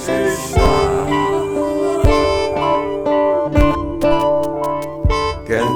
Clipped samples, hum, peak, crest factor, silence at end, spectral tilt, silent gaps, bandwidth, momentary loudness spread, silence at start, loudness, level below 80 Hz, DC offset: under 0.1%; none; 0 dBFS; 16 dB; 0 s; -6 dB/octave; none; 20 kHz; 5 LU; 0 s; -17 LUFS; -24 dBFS; under 0.1%